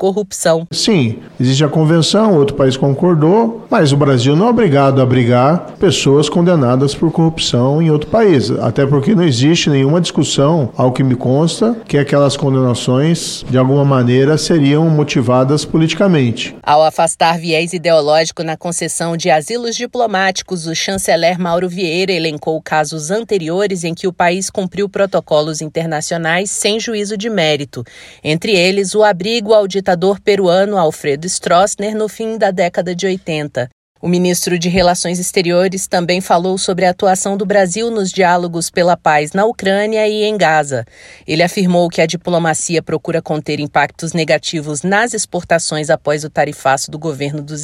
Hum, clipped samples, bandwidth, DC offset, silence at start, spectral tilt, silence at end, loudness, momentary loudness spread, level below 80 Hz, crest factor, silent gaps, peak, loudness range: none; under 0.1%; 13.5 kHz; under 0.1%; 0 s; -5 dB/octave; 0 s; -13 LUFS; 8 LU; -46 dBFS; 12 dB; 33.72-33.95 s; 0 dBFS; 4 LU